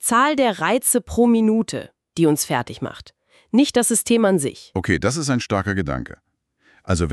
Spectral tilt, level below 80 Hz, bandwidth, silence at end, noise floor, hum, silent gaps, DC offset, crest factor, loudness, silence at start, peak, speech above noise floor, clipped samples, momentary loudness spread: -4.5 dB/octave; -42 dBFS; 13.5 kHz; 0 s; -60 dBFS; none; none; under 0.1%; 16 dB; -19 LUFS; 0 s; -4 dBFS; 41 dB; under 0.1%; 13 LU